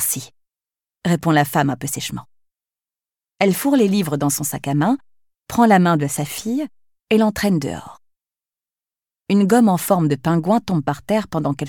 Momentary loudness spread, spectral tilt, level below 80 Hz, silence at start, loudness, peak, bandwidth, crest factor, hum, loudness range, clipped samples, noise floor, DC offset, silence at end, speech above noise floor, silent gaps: 11 LU; -5.5 dB/octave; -54 dBFS; 0 s; -19 LUFS; -4 dBFS; 19 kHz; 16 dB; none; 4 LU; under 0.1%; under -90 dBFS; under 0.1%; 0 s; over 72 dB; none